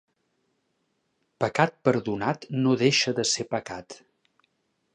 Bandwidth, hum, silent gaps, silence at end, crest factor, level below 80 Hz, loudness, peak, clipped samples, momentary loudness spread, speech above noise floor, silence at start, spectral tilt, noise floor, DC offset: 10.5 kHz; none; none; 1 s; 24 dB; -66 dBFS; -25 LUFS; -4 dBFS; under 0.1%; 10 LU; 49 dB; 1.4 s; -4 dB/octave; -74 dBFS; under 0.1%